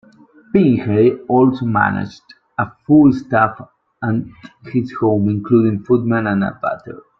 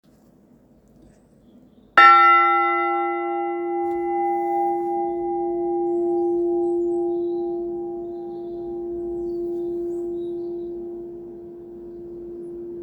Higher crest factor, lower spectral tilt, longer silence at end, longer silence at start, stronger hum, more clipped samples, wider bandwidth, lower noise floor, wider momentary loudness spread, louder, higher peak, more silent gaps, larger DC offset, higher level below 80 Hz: second, 16 dB vs 22 dB; first, -9.5 dB/octave vs -5.5 dB/octave; first, 0.25 s vs 0 s; second, 0.55 s vs 1.95 s; neither; neither; first, 6.4 kHz vs 5.8 kHz; second, -47 dBFS vs -54 dBFS; second, 11 LU vs 21 LU; first, -16 LUFS vs -21 LUFS; about the same, -2 dBFS vs 0 dBFS; neither; neither; first, -50 dBFS vs -58 dBFS